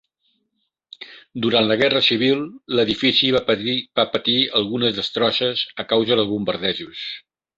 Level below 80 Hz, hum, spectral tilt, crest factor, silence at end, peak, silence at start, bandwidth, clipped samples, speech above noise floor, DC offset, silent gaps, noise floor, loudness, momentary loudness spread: -56 dBFS; none; -5.5 dB/octave; 18 dB; 0.4 s; -2 dBFS; 1 s; 7.8 kHz; under 0.1%; 54 dB; under 0.1%; none; -73 dBFS; -19 LUFS; 14 LU